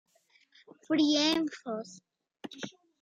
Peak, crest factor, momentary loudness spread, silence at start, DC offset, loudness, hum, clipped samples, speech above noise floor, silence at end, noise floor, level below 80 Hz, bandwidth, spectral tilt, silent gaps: -12 dBFS; 20 dB; 22 LU; 0.9 s; under 0.1%; -29 LUFS; none; under 0.1%; 37 dB; 0.3 s; -67 dBFS; -78 dBFS; 11 kHz; -3 dB/octave; none